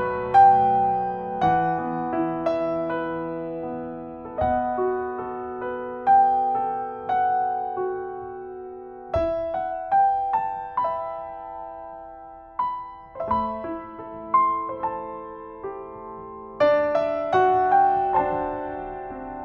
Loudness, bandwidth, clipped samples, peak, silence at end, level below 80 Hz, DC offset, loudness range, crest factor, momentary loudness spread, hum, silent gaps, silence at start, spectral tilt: -23 LUFS; 5.8 kHz; under 0.1%; -6 dBFS; 0 s; -50 dBFS; under 0.1%; 6 LU; 18 dB; 18 LU; none; none; 0 s; -8 dB/octave